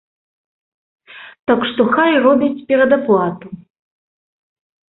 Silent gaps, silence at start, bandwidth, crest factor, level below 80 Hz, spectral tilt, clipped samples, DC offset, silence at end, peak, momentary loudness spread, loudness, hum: 1.39-1.43 s; 1.15 s; 4.1 kHz; 16 dB; -58 dBFS; -10.5 dB/octave; under 0.1%; under 0.1%; 1.4 s; -2 dBFS; 13 LU; -15 LUFS; none